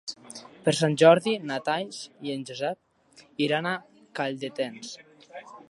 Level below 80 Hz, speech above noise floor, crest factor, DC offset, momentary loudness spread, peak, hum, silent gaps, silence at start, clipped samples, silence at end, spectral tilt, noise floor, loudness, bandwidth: -74 dBFS; 20 dB; 24 dB; under 0.1%; 25 LU; -4 dBFS; none; none; 0.05 s; under 0.1%; 0.15 s; -5 dB/octave; -46 dBFS; -26 LUFS; 11.5 kHz